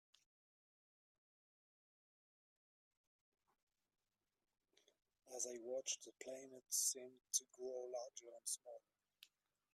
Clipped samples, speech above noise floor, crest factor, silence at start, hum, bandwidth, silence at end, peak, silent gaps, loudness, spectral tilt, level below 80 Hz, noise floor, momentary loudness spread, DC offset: under 0.1%; 24 dB; 28 dB; 5.25 s; none; 15.5 kHz; 0.45 s; -24 dBFS; none; -46 LUFS; 0.5 dB/octave; under -90 dBFS; -72 dBFS; 16 LU; under 0.1%